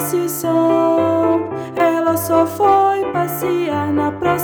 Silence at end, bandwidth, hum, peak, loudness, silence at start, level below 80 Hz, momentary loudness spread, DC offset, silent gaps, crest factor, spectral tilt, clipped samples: 0 s; over 20 kHz; none; -2 dBFS; -16 LUFS; 0 s; -54 dBFS; 5 LU; under 0.1%; none; 14 dB; -5.5 dB/octave; under 0.1%